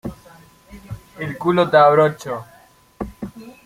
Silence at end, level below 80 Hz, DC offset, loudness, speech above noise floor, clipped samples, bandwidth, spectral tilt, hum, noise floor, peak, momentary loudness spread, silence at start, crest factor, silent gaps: 0.15 s; -48 dBFS; under 0.1%; -16 LUFS; 31 dB; under 0.1%; 16 kHz; -6.5 dB/octave; none; -47 dBFS; -2 dBFS; 23 LU; 0.05 s; 18 dB; none